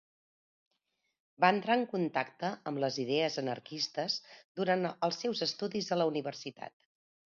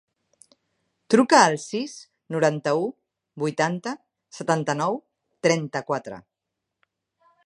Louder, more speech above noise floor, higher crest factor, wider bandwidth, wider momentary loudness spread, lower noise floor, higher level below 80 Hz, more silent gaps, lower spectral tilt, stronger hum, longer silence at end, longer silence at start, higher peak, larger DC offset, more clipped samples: second, -33 LUFS vs -23 LUFS; second, 48 dB vs 61 dB; about the same, 24 dB vs 24 dB; second, 7.2 kHz vs 11.5 kHz; second, 11 LU vs 17 LU; about the same, -82 dBFS vs -83 dBFS; second, -82 dBFS vs -74 dBFS; first, 4.44-4.55 s vs none; second, -3 dB/octave vs -4.5 dB/octave; neither; second, 0.6 s vs 1.25 s; first, 1.4 s vs 1.1 s; second, -12 dBFS vs -2 dBFS; neither; neither